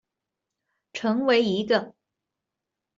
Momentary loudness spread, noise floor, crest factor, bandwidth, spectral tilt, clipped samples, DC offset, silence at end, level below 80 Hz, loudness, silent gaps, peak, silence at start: 16 LU; -86 dBFS; 18 dB; 7.6 kHz; -5.5 dB/octave; under 0.1%; under 0.1%; 1.05 s; -70 dBFS; -24 LUFS; none; -8 dBFS; 0.95 s